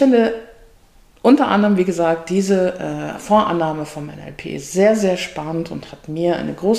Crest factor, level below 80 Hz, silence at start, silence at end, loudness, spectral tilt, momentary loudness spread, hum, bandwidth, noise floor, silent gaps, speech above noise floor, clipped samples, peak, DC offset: 16 dB; -50 dBFS; 0 s; 0 s; -18 LUFS; -6 dB/octave; 15 LU; none; 15 kHz; -50 dBFS; none; 33 dB; under 0.1%; -2 dBFS; 0.1%